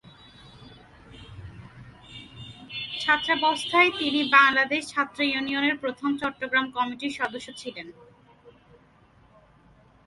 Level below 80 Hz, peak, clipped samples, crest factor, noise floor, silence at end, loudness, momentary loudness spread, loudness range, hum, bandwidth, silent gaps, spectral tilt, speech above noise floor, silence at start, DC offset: -60 dBFS; -2 dBFS; under 0.1%; 26 dB; -57 dBFS; 1.55 s; -23 LUFS; 25 LU; 10 LU; none; 11.5 kHz; none; -3.5 dB/octave; 33 dB; 0.05 s; under 0.1%